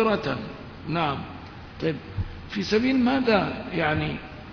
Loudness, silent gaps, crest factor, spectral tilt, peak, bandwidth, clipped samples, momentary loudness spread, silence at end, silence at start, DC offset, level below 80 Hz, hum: -26 LUFS; none; 20 dB; -6.5 dB/octave; -6 dBFS; 5.4 kHz; under 0.1%; 16 LU; 0 s; 0 s; under 0.1%; -46 dBFS; none